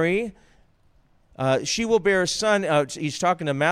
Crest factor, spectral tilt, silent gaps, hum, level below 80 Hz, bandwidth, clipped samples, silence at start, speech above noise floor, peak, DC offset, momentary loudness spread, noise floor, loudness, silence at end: 16 dB; -4 dB/octave; none; none; -54 dBFS; 15 kHz; under 0.1%; 0 s; 37 dB; -8 dBFS; under 0.1%; 7 LU; -59 dBFS; -22 LUFS; 0 s